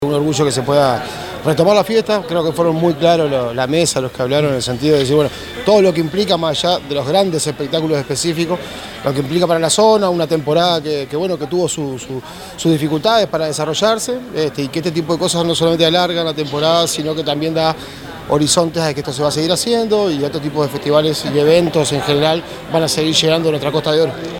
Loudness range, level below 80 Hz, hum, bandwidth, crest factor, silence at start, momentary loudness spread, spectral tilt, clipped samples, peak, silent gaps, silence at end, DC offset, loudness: 2 LU; -46 dBFS; none; 19.5 kHz; 16 dB; 0 s; 8 LU; -4.5 dB/octave; under 0.1%; 0 dBFS; none; 0 s; under 0.1%; -15 LUFS